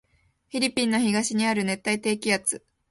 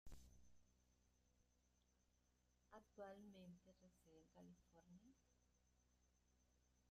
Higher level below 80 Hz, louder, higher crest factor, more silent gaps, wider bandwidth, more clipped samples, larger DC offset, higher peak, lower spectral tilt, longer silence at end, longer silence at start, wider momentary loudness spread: first, -64 dBFS vs -76 dBFS; first, -25 LUFS vs -65 LUFS; about the same, 18 dB vs 20 dB; neither; about the same, 12 kHz vs 13 kHz; neither; neither; first, -8 dBFS vs -48 dBFS; second, -3.5 dB/octave vs -5.5 dB/octave; first, 0.35 s vs 0 s; first, 0.55 s vs 0.05 s; second, 5 LU vs 9 LU